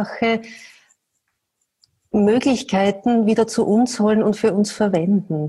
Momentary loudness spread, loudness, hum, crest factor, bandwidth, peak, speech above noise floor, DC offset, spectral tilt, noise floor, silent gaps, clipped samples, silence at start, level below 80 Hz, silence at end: 4 LU; -18 LUFS; none; 12 dB; 12 kHz; -6 dBFS; 56 dB; under 0.1%; -6 dB/octave; -74 dBFS; none; under 0.1%; 0 s; -56 dBFS; 0 s